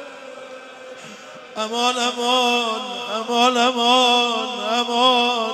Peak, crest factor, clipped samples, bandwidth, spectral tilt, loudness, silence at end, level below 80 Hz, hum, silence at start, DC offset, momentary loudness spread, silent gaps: -2 dBFS; 18 dB; under 0.1%; 14.5 kHz; -1 dB/octave; -18 LUFS; 0 s; -74 dBFS; none; 0 s; under 0.1%; 22 LU; none